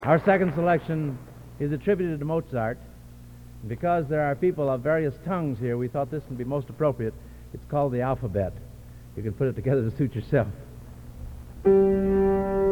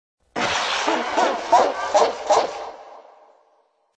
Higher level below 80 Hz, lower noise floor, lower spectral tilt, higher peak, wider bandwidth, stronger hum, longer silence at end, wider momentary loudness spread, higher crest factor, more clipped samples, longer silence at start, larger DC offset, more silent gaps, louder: first, -44 dBFS vs -60 dBFS; second, -45 dBFS vs -63 dBFS; first, -9 dB/octave vs -2 dB/octave; about the same, -6 dBFS vs -4 dBFS; first, 19.5 kHz vs 10 kHz; first, 60 Hz at -45 dBFS vs none; second, 0 s vs 1 s; first, 21 LU vs 16 LU; about the same, 18 dB vs 20 dB; neither; second, 0 s vs 0.35 s; neither; neither; second, -26 LUFS vs -20 LUFS